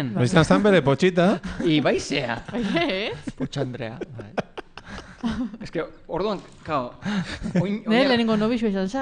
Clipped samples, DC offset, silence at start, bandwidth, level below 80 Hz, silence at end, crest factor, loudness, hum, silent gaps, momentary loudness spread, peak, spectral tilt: under 0.1%; under 0.1%; 0 s; 10 kHz; -46 dBFS; 0 s; 20 dB; -23 LUFS; none; none; 14 LU; -4 dBFS; -6 dB/octave